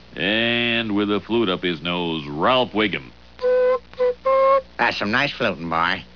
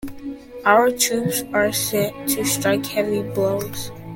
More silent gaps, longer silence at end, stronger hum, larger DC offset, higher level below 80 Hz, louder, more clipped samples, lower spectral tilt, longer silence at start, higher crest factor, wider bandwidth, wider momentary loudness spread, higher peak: neither; about the same, 0.1 s vs 0 s; first, 60 Hz at -50 dBFS vs none; first, 0.3% vs under 0.1%; about the same, -50 dBFS vs -50 dBFS; about the same, -20 LUFS vs -20 LUFS; neither; first, -6 dB/octave vs -3.5 dB/octave; about the same, 0.1 s vs 0 s; about the same, 16 dB vs 20 dB; second, 5.4 kHz vs 17 kHz; second, 5 LU vs 14 LU; second, -6 dBFS vs 0 dBFS